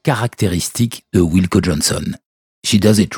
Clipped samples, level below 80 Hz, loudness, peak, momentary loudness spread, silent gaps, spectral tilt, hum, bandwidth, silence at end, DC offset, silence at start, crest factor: under 0.1%; -38 dBFS; -16 LUFS; 0 dBFS; 10 LU; 2.26-2.62 s; -5 dB/octave; none; 19.5 kHz; 0 s; under 0.1%; 0.05 s; 16 dB